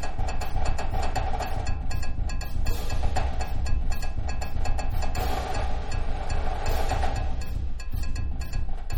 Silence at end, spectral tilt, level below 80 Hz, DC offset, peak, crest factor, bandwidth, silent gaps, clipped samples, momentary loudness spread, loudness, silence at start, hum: 0 s; -5 dB/octave; -26 dBFS; under 0.1%; -10 dBFS; 12 dB; 16.5 kHz; none; under 0.1%; 4 LU; -31 LUFS; 0 s; none